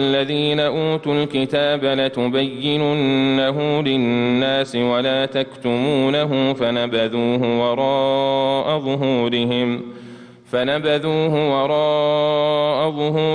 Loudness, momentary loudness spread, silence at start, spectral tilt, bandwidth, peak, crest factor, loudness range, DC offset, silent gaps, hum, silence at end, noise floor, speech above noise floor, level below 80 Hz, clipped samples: -19 LUFS; 3 LU; 0 s; -7 dB/octave; 10 kHz; -8 dBFS; 12 dB; 2 LU; under 0.1%; none; none; 0 s; -40 dBFS; 21 dB; -58 dBFS; under 0.1%